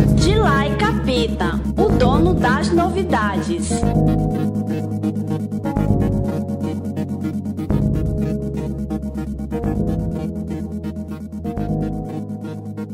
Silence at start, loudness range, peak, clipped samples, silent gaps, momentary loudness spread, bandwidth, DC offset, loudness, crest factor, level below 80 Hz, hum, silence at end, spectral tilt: 0 s; 7 LU; -2 dBFS; under 0.1%; none; 11 LU; 15 kHz; under 0.1%; -20 LUFS; 18 dB; -28 dBFS; none; 0 s; -7 dB/octave